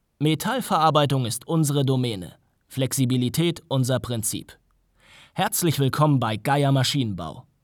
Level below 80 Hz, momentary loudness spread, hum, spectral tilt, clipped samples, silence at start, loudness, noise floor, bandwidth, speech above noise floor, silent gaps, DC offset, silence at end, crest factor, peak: -56 dBFS; 12 LU; none; -5 dB/octave; under 0.1%; 0.2 s; -23 LUFS; -60 dBFS; over 20 kHz; 37 dB; none; under 0.1%; 0.2 s; 18 dB; -6 dBFS